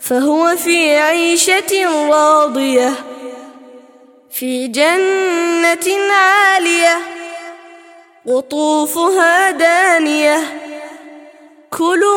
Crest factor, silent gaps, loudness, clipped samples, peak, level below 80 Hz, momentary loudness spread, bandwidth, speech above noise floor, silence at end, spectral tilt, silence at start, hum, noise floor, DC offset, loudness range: 14 dB; none; -12 LUFS; under 0.1%; 0 dBFS; -66 dBFS; 18 LU; 17 kHz; 32 dB; 0 s; -1 dB/octave; 0 s; none; -44 dBFS; under 0.1%; 3 LU